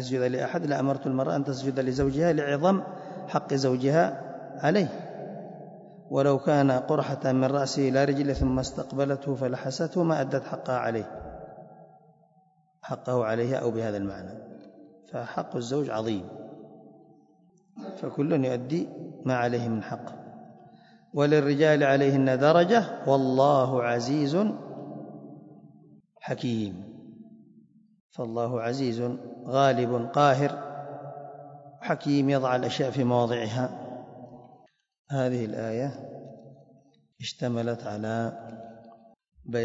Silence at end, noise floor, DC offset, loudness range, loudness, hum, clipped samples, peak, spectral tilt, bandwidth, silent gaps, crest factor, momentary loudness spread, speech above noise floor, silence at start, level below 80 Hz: 0 s; -64 dBFS; under 0.1%; 11 LU; -27 LUFS; none; under 0.1%; -6 dBFS; -6.5 dB/octave; 7.8 kHz; 28.00-28.10 s, 34.99-35.05 s; 20 dB; 21 LU; 38 dB; 0 s; -54 dBFS